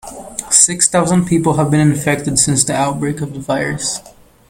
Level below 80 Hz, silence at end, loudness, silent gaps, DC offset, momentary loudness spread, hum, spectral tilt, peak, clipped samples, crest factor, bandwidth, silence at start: -44 dBFS; 0.5 s; -14 LUFS; none; under 0.1%; 11 LU; none; -4 dB/octave; 0 dBFS; under 0.1%; 16 dB; over 20 kHz; 0.05 s